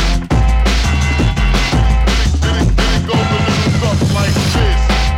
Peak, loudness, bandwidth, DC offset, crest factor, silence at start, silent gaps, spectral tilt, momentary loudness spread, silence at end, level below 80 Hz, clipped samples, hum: 0 dBFS; -14 LUFS; 14 kHz; under 0.1%; 12 dB; 0 s; none; -5 dB/octave; 1 LU; 0 s; -14 dBFS; under 0.1%; none